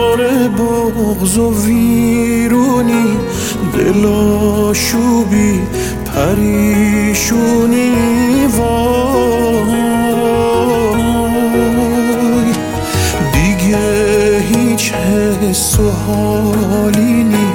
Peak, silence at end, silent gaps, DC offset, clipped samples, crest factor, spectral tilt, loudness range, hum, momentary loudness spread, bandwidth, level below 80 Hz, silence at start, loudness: 0 dBFS; 0 s; none; under 0.1%; under 0.1%; 12 dB; -5.5 dB/octave; 1 LU; none; 3 LU; 17 kHz; -28 dBFS; 0 s; -12 LUFS